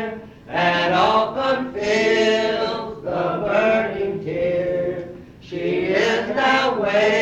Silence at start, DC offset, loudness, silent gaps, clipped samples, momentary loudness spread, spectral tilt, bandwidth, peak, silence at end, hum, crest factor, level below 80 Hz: 0 s; under 0.1%; -20 LUFS; none; under 0.1%; 11 LU; -5 dB/octave; 9.2 kHz; -4 dBFS; 0 s; none; 16 dB; -52 dBFS